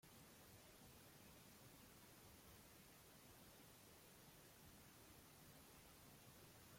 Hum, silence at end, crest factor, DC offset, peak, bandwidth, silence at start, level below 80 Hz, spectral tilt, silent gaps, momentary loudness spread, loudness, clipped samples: none; 0 s; 14 dB; under 0.1%; -52 dBFS; 16.5 kHz; 0 s; -80 dBFS; -3.5 dB/octave; none; 1 LU; -65 LUFS; under 0.1%